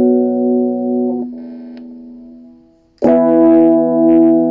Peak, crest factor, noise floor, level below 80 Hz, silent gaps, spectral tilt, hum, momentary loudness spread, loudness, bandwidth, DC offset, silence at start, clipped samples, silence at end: 0 dBFS; 12 dB; -47 dBFS; -56 dBFS; none; -10.5 dB/octave; none; 22 LU; -12 LUFS; 3 kHz; under 0.1%; 0 s; under 0.1%; 0 s